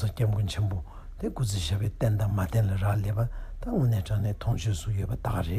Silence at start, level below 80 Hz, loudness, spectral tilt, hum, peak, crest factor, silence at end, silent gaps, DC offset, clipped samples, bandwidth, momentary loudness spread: 0 s; -38 dBFS; -29 LUFS; -6.5 dB/octave; none; -14 dBFS; 14 dB; 0 s; none; under 0.1%; under 0.1%; 15 kHz; 7 LU